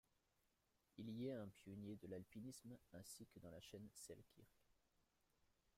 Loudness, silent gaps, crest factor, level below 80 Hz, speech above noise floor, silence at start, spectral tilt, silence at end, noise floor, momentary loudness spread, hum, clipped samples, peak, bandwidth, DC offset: -57 LUFS; none; 18 dB; -84 dBFS; 30 dB; 0.95 s; -5.5 dB/octave; 1.05 s; -86 dBFS; 10 LU; none; under 0.1%; -40 dBFS; 16 kHz; under 0.1%